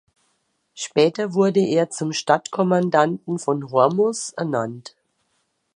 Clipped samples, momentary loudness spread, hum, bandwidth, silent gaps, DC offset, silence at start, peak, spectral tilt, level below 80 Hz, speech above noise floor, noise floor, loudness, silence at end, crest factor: under 0.1%; 8 LU; none; 11 kHz; none; under 0.1%; 0.75 s; -2 dBFS; -5 dB/octave; -72 dBFS; 50 dB; -70 dBFS; -20 LUFS; 0.9 s; 20 dB